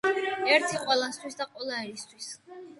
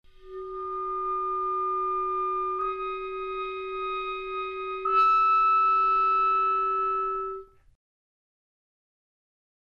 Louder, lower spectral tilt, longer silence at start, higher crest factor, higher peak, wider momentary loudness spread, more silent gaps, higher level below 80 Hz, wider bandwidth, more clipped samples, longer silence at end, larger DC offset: about the same, -27 LUFS vs -26 LUFS; second, -2 dB/octave vs -5 dB/octave; second, 0.05 s vs 0.2 s; first, 22 dB vs 14 dB; first, -8 dBFS vs -14 dBFS; first, 17 LU vs 13 LU; neither; second, -76 dBFS vs -56 dBFS; first, 11.5 kHz vs 5.6 kHz; neither; second, 0 s vs 2.35 s; neither